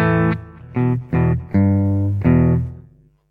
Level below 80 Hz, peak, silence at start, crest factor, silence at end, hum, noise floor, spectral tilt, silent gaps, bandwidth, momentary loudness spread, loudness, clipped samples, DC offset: -34 dBFS; -2 dBFS; 0 s; 14 dB; 0.5 s; none; -49 dBFS; -11 dB/octave; none; 4.3 kHz; 9 LU; -18 LUFS; under 0.1%; under 0.1%